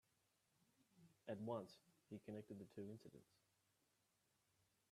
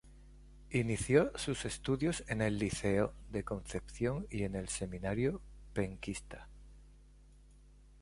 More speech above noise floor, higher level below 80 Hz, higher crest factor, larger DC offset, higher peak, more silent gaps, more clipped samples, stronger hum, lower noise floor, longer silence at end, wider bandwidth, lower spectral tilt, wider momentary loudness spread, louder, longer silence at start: first, 31 dB vs 24 dB; second, under -90 dBFS vs -52 dBFS; about the same, 22 dB vs 22 dB; neither; second, -36 dBFS vs -14 dBFS; neither; neither; neither; first, -85 dBFS vs -59 dBFS; first, 1.7 s vs 0 s; first, 13.5 kHz vs 11.5 kHz; first, -7 dB/octave vs -5.5 dB/octave; about the same, 13 LU vs 13 LU; second, -55 LUFS vs -36 LUFS; first, 0.95 s vs 0.05 s